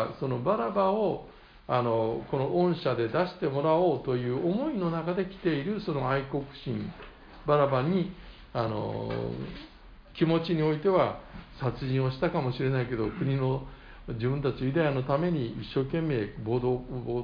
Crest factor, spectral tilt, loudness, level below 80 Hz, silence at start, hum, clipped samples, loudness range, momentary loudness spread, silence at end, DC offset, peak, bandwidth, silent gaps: 18 dB; -9.5 dB/octave; -29 LUFS; -50 dBFS; 0 s; none; under 0.1%; 3 LU; 11 LU; 0 s; under 0.1%; -12 dBFS; 5.2 kHz; none